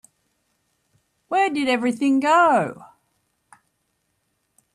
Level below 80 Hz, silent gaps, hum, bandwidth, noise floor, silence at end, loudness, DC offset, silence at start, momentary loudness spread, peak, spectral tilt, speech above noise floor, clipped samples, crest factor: -72 dBFS; none; none; 12.5 kHz; -72 dBFS; 1.9 s; -20 LUFS; under 0.1%; 1.3 s; 7 LU; -8 dBFS; -4.5 dB/octave; 53 dB; under 0.1%; 16 dB